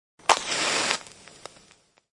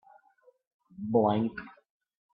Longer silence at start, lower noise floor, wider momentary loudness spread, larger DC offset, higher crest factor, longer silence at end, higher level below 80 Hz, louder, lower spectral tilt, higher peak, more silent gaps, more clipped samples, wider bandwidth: second, 0.3 s vs 1 s; second, -59 dBFS vs -65 dBFS; first, 23 LU vs 20 LU; neither; first, 28 dB vs 20 dB; first, 1.05 s vs 0.65 s; first, -64 dBFS vs -70 dBFS; first, -24 LUFS vs -28 LUFS; second, 0 dB/octave vs -11 dB/octave; first, -2 dBFS vs -14 dBFS; neither; neither; first, 11.5 kHz vs 5 kHz